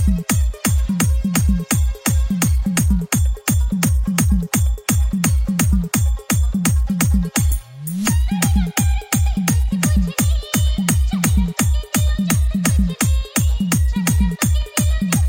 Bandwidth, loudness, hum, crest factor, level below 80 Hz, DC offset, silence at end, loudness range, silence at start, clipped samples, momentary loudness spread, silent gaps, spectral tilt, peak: 16.5 kHz; -18 LUFS; none; 16 dB; -20 dBFS; under 0.1%; 0 s; 1 LU; 0 s; under 0.1%; 2 LU; none; -4.5 dB/octave; 0 dBFS